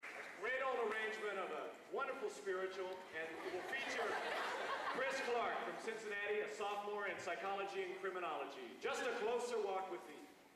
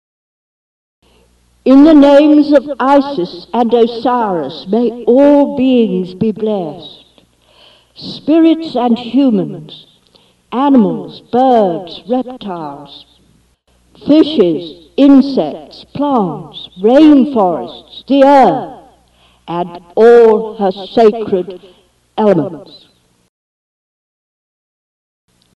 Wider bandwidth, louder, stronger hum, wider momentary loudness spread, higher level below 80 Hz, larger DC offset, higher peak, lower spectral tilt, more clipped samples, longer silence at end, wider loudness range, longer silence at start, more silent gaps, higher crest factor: first, 15 kHz vs 7.2 kHz; second, -43 LUFS vs -11 LUFS; neither; second, 7 LU vs 18 LU; second, -84 dBFS vs -50 dBFS; neither; second, -30 dBFS vs 0 dBFS; second, -2.5 dB/octave vs -7.5 dB/octave; neither; second, 0 s vs 2.9 s; second, 2 LU vs 6 LU; second, 0 s vs 1.65 s; neither; about the same, 12 dB vs 12 dB